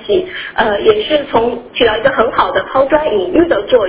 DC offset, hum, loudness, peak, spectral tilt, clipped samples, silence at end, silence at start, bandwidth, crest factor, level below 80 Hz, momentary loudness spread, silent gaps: under 0.1%; none; -13 LUFS; 0 dBFS; -8.5 dB/octave; under 0.1%; 0 s; 0 s; 4 kHz; 12 dB; -40 dBFS; 4 LU; none